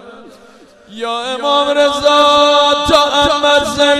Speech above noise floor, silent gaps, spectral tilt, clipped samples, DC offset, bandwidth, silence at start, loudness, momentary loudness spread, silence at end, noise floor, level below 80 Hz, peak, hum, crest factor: 30 dB; none; -2.5 dB/octave; under 0.1%; under 0.1%; 14.5 kHz; 0.05 s; -11 LUFS; 10 LU; 0 s; -42 dBFS; -40 dBFS; 0 dBFS; none; 12 dB